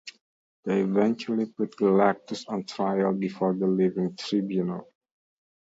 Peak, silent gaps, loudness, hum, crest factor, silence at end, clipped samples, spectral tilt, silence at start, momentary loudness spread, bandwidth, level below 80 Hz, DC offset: -8 dBFS; 0.21-0.63 s; -26 LUFS; none; 20 dB; 0.85 s; under 0.1%; -7 dB/octave; 0.05 s; 10 LU; 7.8 kHz; -72 dBFS; under 0.1%